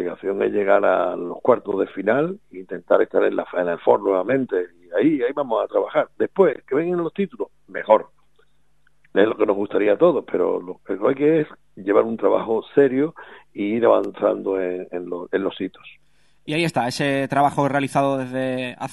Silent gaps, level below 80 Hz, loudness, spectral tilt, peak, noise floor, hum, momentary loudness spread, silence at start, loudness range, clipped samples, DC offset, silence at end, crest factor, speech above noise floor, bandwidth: none; -66 dBFS; -21 LUFS; -6.5 dB/octave; 0 dBFS; -65 dBFS; none; 10 LU; 0 s; 3 LU; under 0.1%; 0.2%; 0 s; 20 dB; 45 dB; 12 kHz